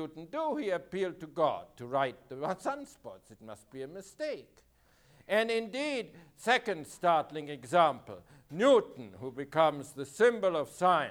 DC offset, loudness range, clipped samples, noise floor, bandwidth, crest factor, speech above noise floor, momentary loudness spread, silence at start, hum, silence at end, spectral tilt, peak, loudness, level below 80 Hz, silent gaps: under 0.1%; 9 LU; under 0.1%; -64 dBFS; 18.5 kHz; 20 dB; 33 dB; 18 LU; 0 s; none; 0 s; -4.5 dB/octave; -12 dBFS; -31 LUFS; -72 dBFS; none